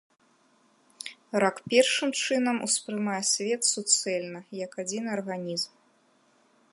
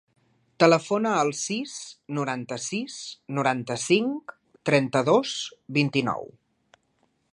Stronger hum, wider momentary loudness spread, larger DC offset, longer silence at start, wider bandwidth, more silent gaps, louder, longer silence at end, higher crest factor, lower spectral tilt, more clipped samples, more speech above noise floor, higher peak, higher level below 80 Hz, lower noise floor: neither; about the same, 14 LU vs 14 LU; neither; first, 1 s vs 0.6 s; about the same, 12 kHz vs 11.5 kHz; neither; about the same, -27 LUFS vs -25 LUFS; about the same, 1.05 s vs 1.1 s; about the same, 22 dB vs 22 dB; second, -2 dB/octave vs -4.5 dB/octave; neither; second, 38 dB vs 45 dB; second, -8 dBFS vs -4 dBFS; second, -78 dBFS vs -70 dBFS; second, -65 dBFS vs -70 dBFS